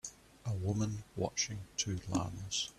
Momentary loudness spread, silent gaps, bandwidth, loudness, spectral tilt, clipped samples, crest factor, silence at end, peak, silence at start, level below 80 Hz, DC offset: 6 LU; none; 13.5 kHz; -37 LUFS; -4 dB/octave; under 0.1%; 18 dB; 0.05 s; -20 dBFS; 0.05 s; -60 dBFS; under 0.1%